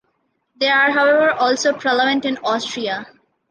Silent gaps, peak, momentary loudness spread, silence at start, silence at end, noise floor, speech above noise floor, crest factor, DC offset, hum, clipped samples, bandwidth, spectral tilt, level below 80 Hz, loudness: none; -4 dBFS; 10 LU; 0.6 s; 0.45 s; -68 dBFS; 51 dB; 14 dB; under 0.1%; none; under 0.1%; 10 kHz; -2.5 dB/octave; -68 dBFS; -17 LUFS